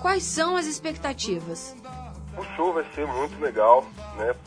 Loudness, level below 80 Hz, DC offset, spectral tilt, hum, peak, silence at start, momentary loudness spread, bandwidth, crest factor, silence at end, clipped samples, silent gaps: -25 LUFS; -46 dBFS; under 0.1%; -3.5 dB/octave; none; -4 dBFS; 0 s; 20 LU; 10.5 kHz; 22 dB; 0 s; under 0.1%; none